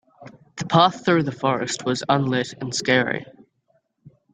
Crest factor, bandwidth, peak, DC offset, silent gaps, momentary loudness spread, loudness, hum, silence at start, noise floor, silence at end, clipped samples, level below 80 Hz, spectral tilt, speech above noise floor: 22 dB; 9.6 kHz; 0 dBFS; under 0.1%; none; 9 LU; -21 LUFS; none; 0.2 s; -67 dBFS; 0.25 s; under 0.1%; -62 dBFS; -4.5 dB/octave; 46 dB